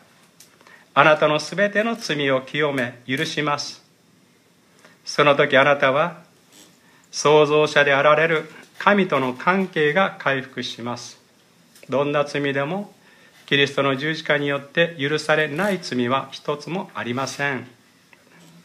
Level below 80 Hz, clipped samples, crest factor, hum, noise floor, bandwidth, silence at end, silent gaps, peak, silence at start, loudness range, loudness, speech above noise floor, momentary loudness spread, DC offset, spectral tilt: -72 dBFS; under 0.1%; 22 dB; none; -57 dBFS; 14.5 kHz; 0.95 s; none; 0 dBFS; 0.95 s; 6 LU; -20 LUFS; 37 dB; 13 LU; under 0.1%; -4.5 dB/octave